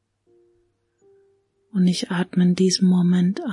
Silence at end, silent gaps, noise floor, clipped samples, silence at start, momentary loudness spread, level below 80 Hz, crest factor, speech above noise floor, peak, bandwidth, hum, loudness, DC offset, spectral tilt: 0 s; none; -66 dBFS; under 0.1%; 1.75 s; 6 LU; -68 dBFS; 14 dB; 47 dB; -8 dBFS; 11 kHz; none; -20 LUFS; under 0.1%; -6 dB/octave